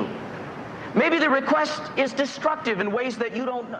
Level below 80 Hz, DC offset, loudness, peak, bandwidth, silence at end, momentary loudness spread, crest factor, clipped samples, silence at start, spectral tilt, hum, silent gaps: -64 dBFS; under 0.1%; -24 LUFS; -8 dBFS; 9.8 kHz; 0 s; 15 LU; 16 dB; under 0.1%; 0 s; -5 dB/octave; none; none